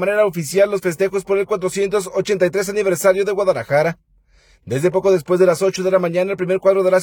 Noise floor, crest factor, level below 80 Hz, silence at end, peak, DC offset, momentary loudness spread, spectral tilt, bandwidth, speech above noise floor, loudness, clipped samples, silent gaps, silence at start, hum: -54 dBFS; 16 dB; -54 dBFS; 0 s; -2 dBFS; under 0.1%; 5 LU; -5.5 dB/octave; 19 kHz; 37 dB; -17 LUFS; under 0.1%; none; 0 s; none